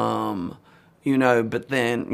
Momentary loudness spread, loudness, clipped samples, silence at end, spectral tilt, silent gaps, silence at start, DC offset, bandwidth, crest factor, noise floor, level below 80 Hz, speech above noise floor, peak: 12 LU; -23 LUFS; under 0.1%; 0 s; -6 dB/octave; none; 0 s; under 0.1%; 15 kHz; 18 dB; -53 dBFS; -62 dBFS; 32 dB; -4 dBFS